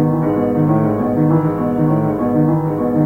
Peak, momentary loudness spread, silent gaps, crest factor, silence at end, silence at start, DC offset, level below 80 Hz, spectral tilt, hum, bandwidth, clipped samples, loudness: -2 dBFS; 2 LU; none; 12 dB; 0 s; 0 s; under 0.1%; -42 dBFS; -11 dB/octave; 50 Hz at -40 dBFS; 3.1 kHz; under 0.1%; -16 LUFS